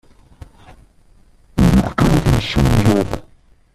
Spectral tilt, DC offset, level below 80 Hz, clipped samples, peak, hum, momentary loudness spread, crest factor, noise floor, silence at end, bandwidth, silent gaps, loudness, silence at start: -6.5 dB/octave; under 0.1%; -26 dBFS; under 0.1%; 0 dBFS; none; 11 LU; 16 dB; -49 dBFS; 0.55 s; 14.5 kHz; none; -16 LUFS; 1.55 s